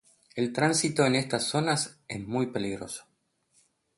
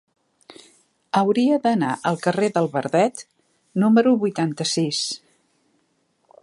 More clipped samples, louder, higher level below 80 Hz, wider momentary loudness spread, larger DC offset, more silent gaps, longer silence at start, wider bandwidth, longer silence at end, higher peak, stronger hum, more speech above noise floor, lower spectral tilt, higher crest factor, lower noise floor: neither; second, -28 LUFS vs -21 LUFS; first, -64 dBFS vs -72 dBFS; first, 14 LU vs 8 LU; neither; neither; second, 0.35 s vs 1.15 s; about the same, 12 kHz vs 11.5 kHz; second, 0.95 s vs 1.25 s; second, -10 dBFS vs -4 dBFS; neither; second, 41 dB vs 47 dB; about the same, -4 dB/octave vs -5 dB/octave; about the same, 20 dB vs 18 dB; about the same, -69 dBFS vs -67 dBFS